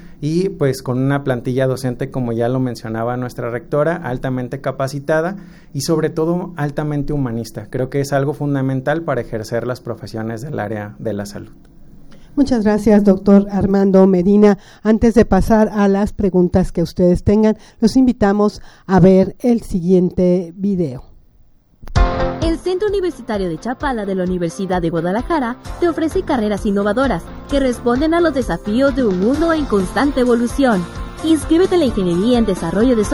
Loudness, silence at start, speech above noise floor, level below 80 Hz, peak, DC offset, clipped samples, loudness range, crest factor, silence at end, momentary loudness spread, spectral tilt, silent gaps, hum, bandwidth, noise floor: -17 LUFS; 0 s; 33 dB; -32 dBFS; -2 dBFS; under 0.1%; under 0.1%; 7 LU; 16 dB; 0 s; 11 LU; -7 dB/octave; none; none; 13 kHz; -49 dBFS